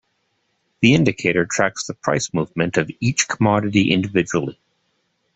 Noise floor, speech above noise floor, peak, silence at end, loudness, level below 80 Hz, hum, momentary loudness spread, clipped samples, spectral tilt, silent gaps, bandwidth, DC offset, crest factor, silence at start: -69 dBFS; 50 dB; 0 dBFS; 0.85 s; -19 LUFS; -52 dBFS; none; 7 LU; under 0.1%; -4.5 dB/octave; none; 8.4 kHz; under 0.1%; 20 dB; 0.8 s